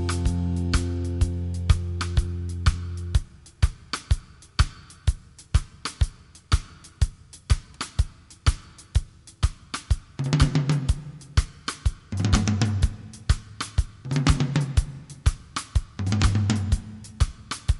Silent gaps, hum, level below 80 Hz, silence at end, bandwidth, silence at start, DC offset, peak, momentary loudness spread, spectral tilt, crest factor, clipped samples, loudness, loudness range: none; none; -28 dBFS; 0 s; 11.5 kHz; 0 s; under 0.1%; -4 dBFS; 9 LU; -5.5 dB/octave; 20 dB; under 0.1%; -27 LUFS; 4 LU